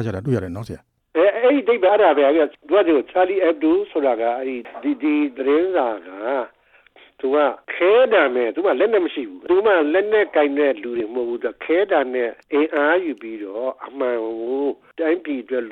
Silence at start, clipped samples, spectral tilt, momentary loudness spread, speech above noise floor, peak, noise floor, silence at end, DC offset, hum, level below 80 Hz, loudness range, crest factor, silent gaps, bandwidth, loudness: 0 s; under 0.1%; -8 dB/octave; 11 LU; 33 dB; -4 dBFS; -52 dBFS; 0 s; under 0.1%; none; -60 dBFS; 5 LU; 14 dB; none; 6 kHz; -19 LUFS